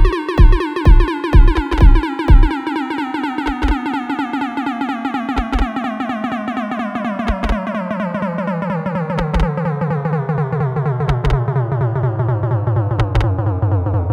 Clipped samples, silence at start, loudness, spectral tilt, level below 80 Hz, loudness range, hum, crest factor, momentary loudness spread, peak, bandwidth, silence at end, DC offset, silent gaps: under 0.1%; 0 s; -18 LUFS; -8 dB/octave; -18 dBFS; 5 LU; none; 14 dB; 7 LU; 0 dBFS; 6.8 kHz; 0 s; under 0.1%; none